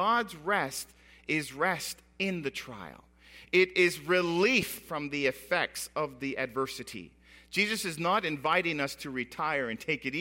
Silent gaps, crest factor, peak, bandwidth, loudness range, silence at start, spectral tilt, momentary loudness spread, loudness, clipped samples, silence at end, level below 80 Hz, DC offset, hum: none; 20 dB; -10 dBFS; 16.5 kHz; 4 LU; 0 s; -4 dB/octave; 14 LU; -30 LUFS; under 0.1%; 0 s; -64 dBFS; under 0.1%; none